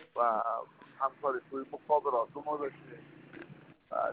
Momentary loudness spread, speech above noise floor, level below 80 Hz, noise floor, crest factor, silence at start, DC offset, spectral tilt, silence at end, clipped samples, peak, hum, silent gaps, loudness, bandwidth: 22 LU; 20 dB; -80 dBFS; -54 dBFS; 20 dB; 0 s; under 0.1%; -4.5 dB/octave; 0 s; under 0.1%; -14 dBFS; none; none; -34 LUFS; 4.5 kHz